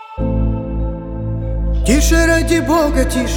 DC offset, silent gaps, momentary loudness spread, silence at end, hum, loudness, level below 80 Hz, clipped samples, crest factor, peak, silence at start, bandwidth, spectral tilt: under 0.1%; none; 10 LU; 0 s; none; -16 LUFS; -20 dBFS; under 0.1%; 14 dB; -2 dBFS; 0 s; 17.5 kHz; -5 dB/octave